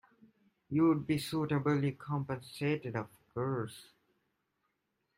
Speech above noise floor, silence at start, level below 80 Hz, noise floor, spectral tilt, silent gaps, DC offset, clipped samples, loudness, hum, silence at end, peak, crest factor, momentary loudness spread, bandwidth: 49 dB; 0.7 s; -70 dBFS; -82 dBFS; -7 dB/octave; none; under 0.1%; under 0.1%; -34 LUFS; none; 1.35 s; -20 dBFS; 16 dB; 12 LU; 16 kHz